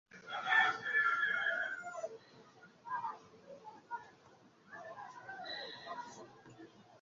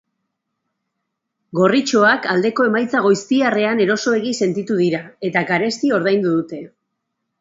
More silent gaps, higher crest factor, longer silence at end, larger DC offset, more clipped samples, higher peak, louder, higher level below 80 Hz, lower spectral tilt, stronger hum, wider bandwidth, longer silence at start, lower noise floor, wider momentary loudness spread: neither; about the same, 22 dB vs 18 dB; second, 0.05 s vs 0.75 s; neither; neither; second, -18 dBFS vs 0 dBFS; second, -36 LUFS vs -17 LUFS; second, -86 dBFS vs -66 dBFS; second, 1.5 dB/octave vs -5 dB/octave; neither; about the same, 7.4 kHz vs 8 kHz; second, 0.1 s vs 1.55 s; second, -64 dBFS vs -77 dBFS; first, 25 LU vs 7 LU